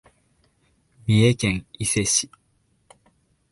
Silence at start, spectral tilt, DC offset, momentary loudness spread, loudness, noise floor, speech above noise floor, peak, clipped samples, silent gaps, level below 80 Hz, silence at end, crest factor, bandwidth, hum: 1.05 s; -4 dB/octave; under 0.1%; 12 LU; -21 LUFS; -66 dBFS; 45 dB; -6 dBFS; under 0.1%; none; -48 dBFS; 1.25 s; 20 dB; 11.5 kHz; none